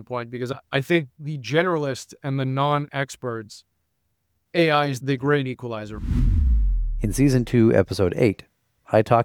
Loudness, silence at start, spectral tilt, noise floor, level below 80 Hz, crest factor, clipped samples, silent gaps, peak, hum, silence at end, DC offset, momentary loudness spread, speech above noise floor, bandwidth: -23 LUFS; 0 s; -6.5 dB/octave; -73 dBFS; -30 dBFS; 20 dB; under 0.1%; none; -2 dBFS; none; 0 s; under 0.1%; 13 LU; 52 dB; 16.5 kHz